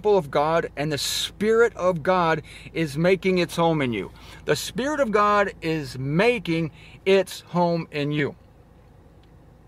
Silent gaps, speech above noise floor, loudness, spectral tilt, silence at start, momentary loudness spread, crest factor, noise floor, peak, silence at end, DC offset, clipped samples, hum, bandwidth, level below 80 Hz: none; 28 dB; -23 LUFS; -5 dB/octave; 0 s; 8 LU; 16 dB; -51 dBFS; -6 dBFS; 1.35 s; under 0.1%; under 0.1%; none; 15.5 kHz; -50 dBFS